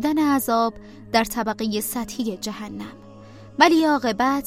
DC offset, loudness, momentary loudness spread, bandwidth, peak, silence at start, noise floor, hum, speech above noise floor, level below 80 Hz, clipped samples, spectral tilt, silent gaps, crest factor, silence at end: 0.2%; -21 LUFS; 17 LU; 16 kHz; 0 dBFS; 0 s; -43 dBFS; none; 21 dB; -52 dBFS; under 0.1%; -3.5 dB/octave; none; 22 dB; 0 s